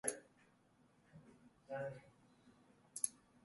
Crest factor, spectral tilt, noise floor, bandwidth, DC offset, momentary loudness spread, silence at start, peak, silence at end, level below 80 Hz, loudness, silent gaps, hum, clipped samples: 34 dB; -2.5 dB/octave; -73 dBFS; 11.5 kHz; under 0.1%; 24 LU; 0.05 s; -18 dBFS; 0.3 s; -84 dBFS; -46 LUFS; none; none; under 0.1%